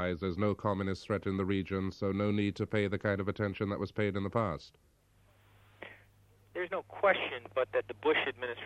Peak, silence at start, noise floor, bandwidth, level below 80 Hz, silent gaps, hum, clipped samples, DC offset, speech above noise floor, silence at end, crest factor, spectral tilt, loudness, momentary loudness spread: -14 dBFS; 0 s; -66 dBFS; 9.4 kHz; -62 dBFS; none; none; under 0.1%; under 0.1%; 33 dB; 0 s; 20 dB; -7.5 dB/octave; -33 LUFS; 8 LU